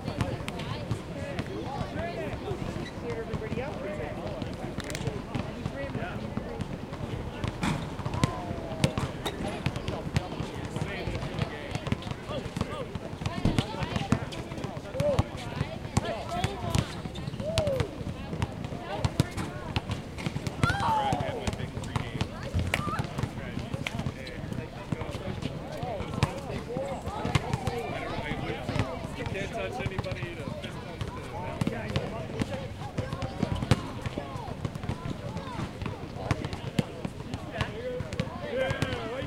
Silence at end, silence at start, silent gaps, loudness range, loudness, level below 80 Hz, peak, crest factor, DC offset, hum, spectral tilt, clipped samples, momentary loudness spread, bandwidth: 0 s; 0 s; none; 4 LU; -33 LUFS; -44 dBFS; -4 dBFS; 28 dB; under 0.1%; none; -6 dB/octave; under 0.1%; 7 LU; 16.5 kHz